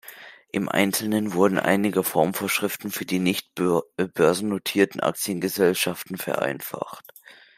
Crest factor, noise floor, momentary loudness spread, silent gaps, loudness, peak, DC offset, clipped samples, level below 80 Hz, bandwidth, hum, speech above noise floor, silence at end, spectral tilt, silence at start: 20 dB; -45 dBFS; 10 LU; none; -24 LUFS; -4 dBFS; under 0.1%; under 0.1%; -68 dBFS; 16 kHz; none; 22 dB; 0.25 s; -4.5 dB/octave; 0.05 s